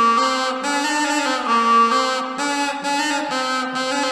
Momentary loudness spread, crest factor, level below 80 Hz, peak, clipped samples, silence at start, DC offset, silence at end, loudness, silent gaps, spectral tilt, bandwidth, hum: 7 LU; 14 dB; -64 dBFS; -4 dBFS; under 0.1%; 0 s; under 0.1%; 0 s; -19 LUFS; none; -1.5 dB/octave; 13.5 kHz; none